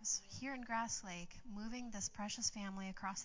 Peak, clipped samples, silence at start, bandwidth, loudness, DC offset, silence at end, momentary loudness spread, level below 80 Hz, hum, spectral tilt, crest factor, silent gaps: -26 dBFS; under 0.1%; 0 s; 7.8 kHz; -44 LUFS; under 0.1%; 0 s; 10 LU; -64 dBFS; none; -2 dB/octave; 18 dB; none